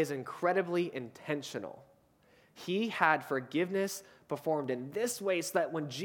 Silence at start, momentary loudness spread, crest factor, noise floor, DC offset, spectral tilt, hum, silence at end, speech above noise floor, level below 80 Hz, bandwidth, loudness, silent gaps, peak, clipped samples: 0 s; 13 LU; 24 dB; -66 dBFS; under 0.1%; -4.5 dB/octave; none; 0 s; 32 dB; -80 dBFS; 19 kHz; -34 LUFS; none; -10 dBFS; under 0.1%